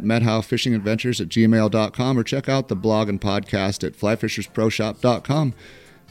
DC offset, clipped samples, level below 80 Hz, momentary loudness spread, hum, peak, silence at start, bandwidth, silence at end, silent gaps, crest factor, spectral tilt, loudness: under 0.1%; under 0.1%; -50 dBFS; 6 LU; none; -4 dBFS; 0 s; 15 kHz; 0.4 s; none; 16 dB; -6 dB/octave; -21 LUFS